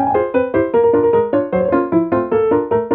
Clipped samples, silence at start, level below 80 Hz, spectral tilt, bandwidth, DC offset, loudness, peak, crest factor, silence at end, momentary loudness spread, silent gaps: under 0.1%; 0 s; -46 dBFS; -12 dB/octave; 3.8 kHz; under 0.1%; -15 LUFS; -2 dBFS; 12 dB; 0 s; 3 LU; none